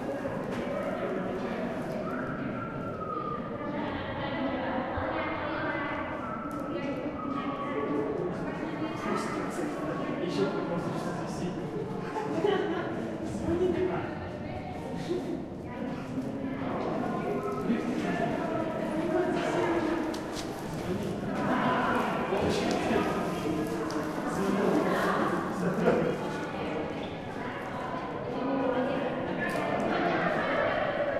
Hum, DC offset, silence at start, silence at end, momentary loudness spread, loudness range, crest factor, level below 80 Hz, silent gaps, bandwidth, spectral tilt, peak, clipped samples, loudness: none; under 0.1%; 0 s; 0 s; 7 LU; 4 LU; 20 dB; -54 dBFS; none; 14.5 kHz; -6.5 dB/octave; -12 dBFS; under 0.1%; -31 LUFS